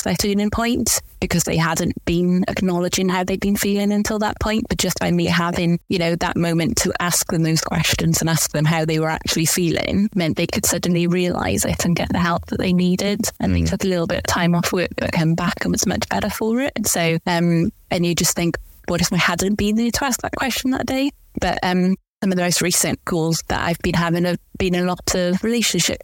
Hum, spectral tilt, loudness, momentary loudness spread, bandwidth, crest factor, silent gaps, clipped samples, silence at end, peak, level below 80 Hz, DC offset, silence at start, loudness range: none; -4.5 dB/octave; -19 LUFS; 4 LU; 17 kHz; 16 dB; 22.08-22.21 s; under 0.1%; 0.05 s; -4 dBFS; -38 dBFS; under 0.1%; 0 s; 1 LU